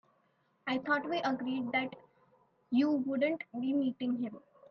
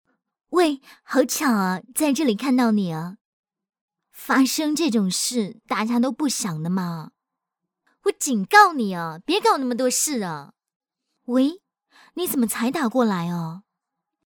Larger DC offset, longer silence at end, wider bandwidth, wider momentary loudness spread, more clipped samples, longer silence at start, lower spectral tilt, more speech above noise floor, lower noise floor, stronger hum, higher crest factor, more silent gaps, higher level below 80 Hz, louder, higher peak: neither; second, 0.3 s vs 0.8 s; second, 6.4 kHz vs 19.5 kHz; second, 9 LU vs 12 LU; neither; first, 0.65 s vs 0.5 s; first, -6 dB/octave vs -4 dB/octave; second, 41 dB vs 62 dB; second, -73 dBFS vs -84 dBFS; neither; second, 16 dB vs 22 dB; second, none vs 3.21-3.44 s, 3.81-3.88 s, 10.76-10.80 s; second, -82 dBFS vs -68 dBFS; second, -34 LUFS vs -22 LUFS; second, -18 dBFS vs 0 dBFS